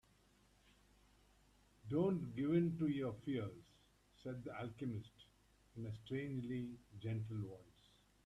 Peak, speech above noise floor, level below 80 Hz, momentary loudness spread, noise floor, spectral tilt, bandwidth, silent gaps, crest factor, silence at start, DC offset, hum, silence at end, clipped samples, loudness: -26 dBFS; 30 dB; -72 dBFS; 16 LU; -72 dBFS; -8.5 dB/octave; 12 kHz; none; 20 dB; 1.85 s; under 0.1%; 50 Hz at -70 dBFS; 0.55 s; under 0.1%; -43 LUFS